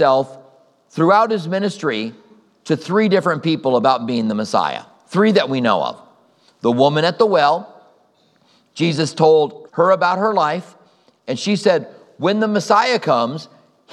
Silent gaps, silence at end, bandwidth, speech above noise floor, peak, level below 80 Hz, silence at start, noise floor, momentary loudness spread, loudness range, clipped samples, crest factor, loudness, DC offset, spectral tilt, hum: none; 0.45 s; 11.5 kHz; 41 dB; 0 dBFS; -76 dBFS; 0 s; -57 dBFS; 10 LU; 2 LU; under 0.1%; 18 dB; -17 LUFS; under 0.1%; -5.5 dB/octave; none